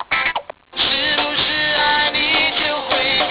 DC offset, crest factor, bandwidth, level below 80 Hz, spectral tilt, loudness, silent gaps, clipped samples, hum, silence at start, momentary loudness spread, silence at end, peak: under 0.1%; 14 dB; 4 kHz; -46 dBFS; -6 dB/octave; -15 LUFS; none; under 0.1%; none; 0 s; 5 LU; 0 s; -4 dBFS